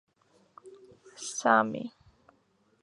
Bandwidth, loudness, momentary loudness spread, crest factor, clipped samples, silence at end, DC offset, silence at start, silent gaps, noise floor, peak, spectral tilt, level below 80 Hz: 11.5 kHz; -28 LUFS; 17 LU; 24 dB; under 0.1%; 0.95 s; under 0.1%; 0.65 s; none; -69 dBFS; -8 dBFS; -3.5 dB/octave; -76 dBFS